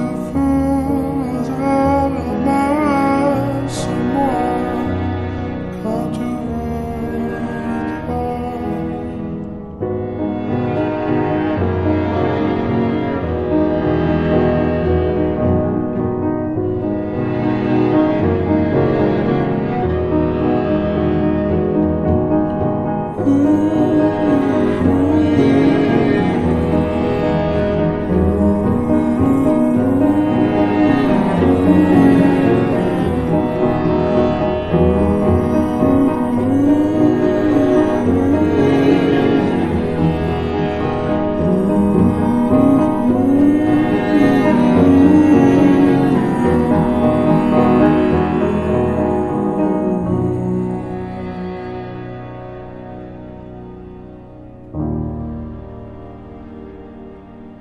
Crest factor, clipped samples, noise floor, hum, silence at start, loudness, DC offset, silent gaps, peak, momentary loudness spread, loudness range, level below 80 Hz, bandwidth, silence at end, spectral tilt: 16 dB; under 0.1%; -36 dBFS; none; 0 s; -16 LUFS; under 0.1%; none; 0 dBFS; 13 LU; 10 LU; -34 dBFS; 12 kHz; 0.05 s; -8.5 dB/octave